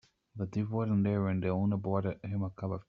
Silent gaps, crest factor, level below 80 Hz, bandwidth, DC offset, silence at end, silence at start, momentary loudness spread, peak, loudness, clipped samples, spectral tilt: none; 16 dB; -66 dBFS; 6.6 kHz; under 0.1%; 0.05 s; 0.35 s; 7 LU; -16 dBFS; -33 LUFS; under 0.1%; -9.5 dB/octave